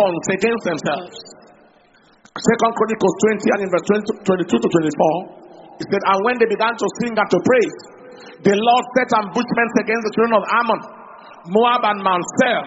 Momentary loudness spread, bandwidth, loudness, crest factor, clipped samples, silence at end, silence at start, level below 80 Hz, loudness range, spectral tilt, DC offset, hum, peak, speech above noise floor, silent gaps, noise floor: 8 LU; 8 kHz; -18 LUFS; 18 dB; under 0.1%; 0 s; 0 s; -60 dBFS; 2 LU; -4 dB/octave; under 0.1%; none; 0 dBFS; 35 dB; none; -53 dBFS